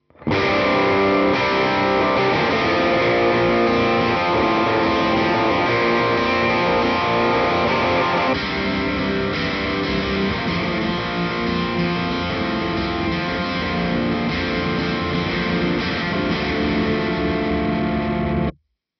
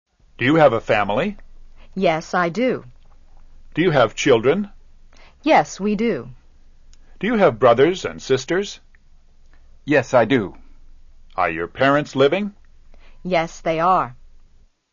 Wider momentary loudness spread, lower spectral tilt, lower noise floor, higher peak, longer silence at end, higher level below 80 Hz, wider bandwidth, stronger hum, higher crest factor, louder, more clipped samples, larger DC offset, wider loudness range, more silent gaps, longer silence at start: second, 5 LU vs 15 LU; about the same, -6.5 dB/octave vs -5.5 dB/octave; second, -40 dBFS vs -51 dBFS; second, -8 dBFS vs -2 dBFS; second, 0.5 s vs 0.8 s; first, -38 dBFS vs -44 dBFS; second, 6.6 kHz vs 7.4 kHz; neither; second, 12 dB vs 18 dB; about the same, -19 LUFS vs -19 LUFS; neither; neither; about the same, 4 LU vs 3 LU; neither; second, 0.2 s vs 0.4 s